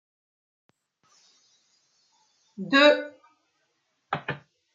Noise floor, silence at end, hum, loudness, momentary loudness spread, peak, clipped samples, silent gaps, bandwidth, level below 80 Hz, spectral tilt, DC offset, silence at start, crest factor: -74 dBFS; 0.4 s; none; -23 LUFS; 22 LU; -6 dBFS; under 0.1%; none; 7.8 kHz; -78 dBFS; -4.5 dB/octave; under 0.1%; 2.6 s; 24 dB